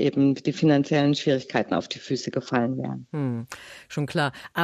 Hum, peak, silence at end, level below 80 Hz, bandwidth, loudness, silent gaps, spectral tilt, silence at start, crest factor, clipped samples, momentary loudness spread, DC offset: none; -6 dBFS; 0 s; -66 dBFS; 13.5 kHz; -25 LUFS; none; -6.5 dB/octave; 0 s; 18 dB; under 0.1%; 10 LU; under 0.1%